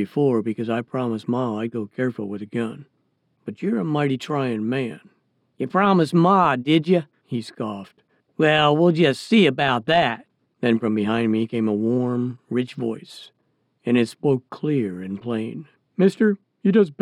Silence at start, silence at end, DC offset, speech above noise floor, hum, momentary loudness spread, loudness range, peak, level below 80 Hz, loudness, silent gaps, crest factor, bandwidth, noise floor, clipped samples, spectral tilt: 0 s; 0.1 s; under 0.1%; 47 dB; none; 14 LU; 7 LU; -4 dBFS; -66 dBFS; -22 LUFS; none; 18 dB; 11.5 kHz; -68 dBFS; under 0.1%; -7 dB/octave